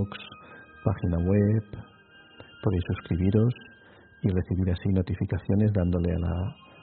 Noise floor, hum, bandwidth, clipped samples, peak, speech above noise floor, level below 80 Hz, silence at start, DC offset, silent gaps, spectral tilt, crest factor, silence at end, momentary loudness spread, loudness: -54 dBFS; none; 4.3 kHz; under 0.1%; -8 dBFS; 28 dB; -44 dBFS; 0 s; under 0.1%; none; -8.5 dB/octave; 18 dB; 0.3 s; 17 LU; -27 LUFS